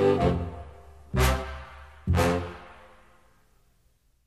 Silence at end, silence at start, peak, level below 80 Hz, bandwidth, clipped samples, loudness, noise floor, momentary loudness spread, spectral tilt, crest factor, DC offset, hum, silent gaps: 1.55 s; 0 s; -10 dBFS; -36 dBFS; 14 kHz; under 0.1%; -27 LUFS; -66 dBFS; 21 LU; -6 dB/octave; 18 dB; 0.1%; none; none